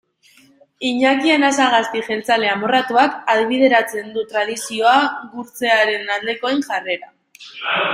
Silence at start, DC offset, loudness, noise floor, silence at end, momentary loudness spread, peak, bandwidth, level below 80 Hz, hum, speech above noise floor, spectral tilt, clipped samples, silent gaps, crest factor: 0.8 s; under 0.1%; -17 LUFS; -52 dBFS; 0 s; 11 LU; -2 dBFS; 16 kHz; -66 dBFS; none; 35 dB; -2.5 dB/octave; under 0.1%; none; 16 dB